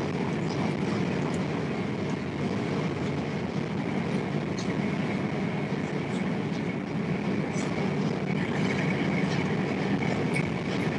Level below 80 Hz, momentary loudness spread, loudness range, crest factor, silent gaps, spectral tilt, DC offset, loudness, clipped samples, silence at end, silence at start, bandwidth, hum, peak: -58 dBFS; 4 LU; 2 LU; 16 dB; none; -6.5 dB/octave; under 0.1%; -29 LUFS; under 0.1%; 0 s; 0 s; 11 kHz; none; -14 dBFS